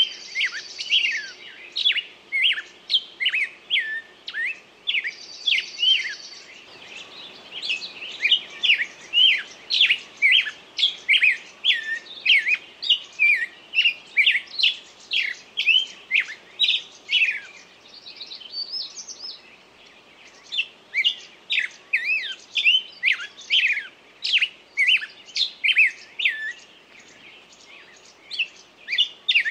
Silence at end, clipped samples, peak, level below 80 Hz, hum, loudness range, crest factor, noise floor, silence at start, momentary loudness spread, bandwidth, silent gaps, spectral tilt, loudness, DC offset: 0 s; under 0.1%; -6 dBFS; -76 dBFS; none; 8 LU; 20 dB; -50 dBFS; 0 s; 16 LU; 13.5 kHz; none; 2.5 dB/octave; -21 LUFS; under 0.1%